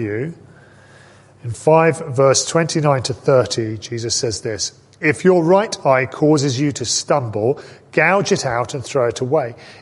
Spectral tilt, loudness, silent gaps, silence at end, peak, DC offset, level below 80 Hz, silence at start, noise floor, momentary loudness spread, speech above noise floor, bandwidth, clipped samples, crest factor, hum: -4.5 dB/octave; -17 LUFS; none; 0.1 s; -2 dBFS; under 0.1%; -52 dBFS; 0 s; -46 dBFS; 10 LU; 29 dB; 11.5 kHz; under 0.1%; 16 dB; none